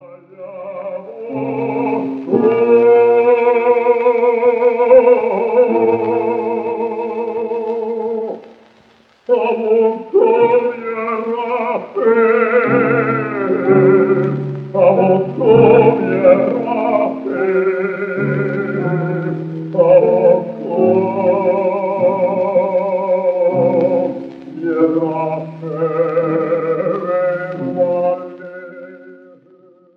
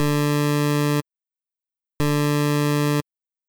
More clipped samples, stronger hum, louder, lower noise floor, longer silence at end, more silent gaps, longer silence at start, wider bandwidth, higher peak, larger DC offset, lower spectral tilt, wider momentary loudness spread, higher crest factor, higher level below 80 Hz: neither; neither; first, -15 LUFS vs -22 LUFS; second, -50 dBFS vs -87 dBFS; first, 0.8 s vs 0.5 s; neither; about the same, 0.05 s vs 0 s; second, 4.6 kHz vs over 20 kHz; first, 0 dBFS vs -12 dBFS; neither; first, -10 dB/octave vs -6 dB/octave; first, 12 LU vs 5 LU; about the same, 14 dB vs 10 dB; second, -60 dBFS vs -52 dBFS